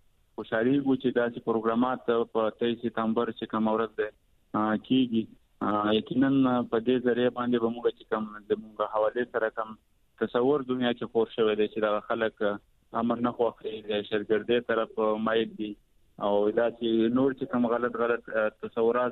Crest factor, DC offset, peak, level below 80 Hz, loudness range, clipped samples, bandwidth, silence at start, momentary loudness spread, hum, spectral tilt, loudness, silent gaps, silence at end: 16 dB; under 0.1%; -12 dBFS; -66 dBFS; 2 LU; under 0.1%; 4.2 kHz; 0.4 s; 8 LU; none; -8.5 dB/octave; -28 LUFS; none; 0 s